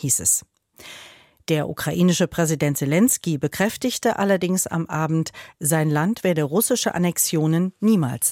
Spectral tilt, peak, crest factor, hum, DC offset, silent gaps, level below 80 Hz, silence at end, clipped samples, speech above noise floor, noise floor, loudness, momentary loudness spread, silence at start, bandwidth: -4.5 dB/octave; -6 dBFS; 16 dB; none; under 0.1%; none; -56 dBFS; 0 s; under 0.1%; 26 dB; -47 dBFS; -21 LUFS; 7 LU; 0 s; 17 kHz